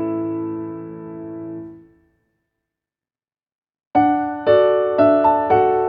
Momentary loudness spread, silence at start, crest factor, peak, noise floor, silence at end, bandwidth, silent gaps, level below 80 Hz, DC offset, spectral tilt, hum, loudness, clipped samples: 18 LU; 0 s; 18 dB; -2 dBFS; under -90 dBFS; 0 s; 5.2 kHz; 3.55-3.62 s, 3.87-3.91 s; -56 dBFS; under 0.1%; -9.5 dB/octave; none; -17 LUFS; under 0.1%